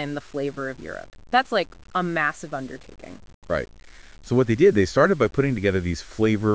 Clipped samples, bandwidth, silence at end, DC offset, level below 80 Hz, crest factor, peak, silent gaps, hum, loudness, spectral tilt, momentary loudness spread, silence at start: under 0.1%; 8 kHz; 0 s; 0.4%; -44 dBFS; 20 dB; -4 dBFS; 3.34-3.42 s; none; -23 LUFS; -6.5 dB/octave; 20 LU; 0 s